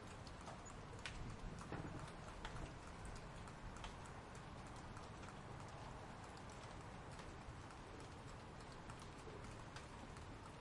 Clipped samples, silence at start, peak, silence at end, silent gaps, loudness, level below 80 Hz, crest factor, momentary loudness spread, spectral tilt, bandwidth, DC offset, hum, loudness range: under 0.1%; 0 s; -32 dBFS; 0 s; none; -55 LUFS; -60 dBFS; 22 dB; 4 LU; -5 dB/octave; 11.5 kHz; under 0.1%; none; 2 LU